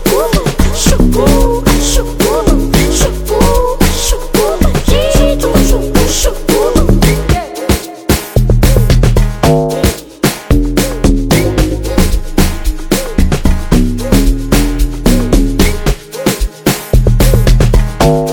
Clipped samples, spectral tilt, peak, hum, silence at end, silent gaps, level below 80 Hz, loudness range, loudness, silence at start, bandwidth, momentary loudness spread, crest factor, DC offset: under 0.1%; -5 dB/octave; 0 dBFS; none; 0 s; none; -12 dBFS; 2 LU; -12 LUFS; 0 s; 19 kHz; 5 LU; 10 dB; under 0.1%